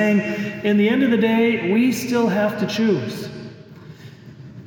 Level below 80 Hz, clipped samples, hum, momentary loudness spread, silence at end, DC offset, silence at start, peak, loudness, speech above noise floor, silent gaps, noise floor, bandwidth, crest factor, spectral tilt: -62 dBFS; under 0.1%; none; 18 LU; 0 s; under 0.1%; 0 s; -6 dBFS; -19 LUFS; 22 dB; none; -40 dBFS; 18 kHz; 12 dB; -6 dB/octave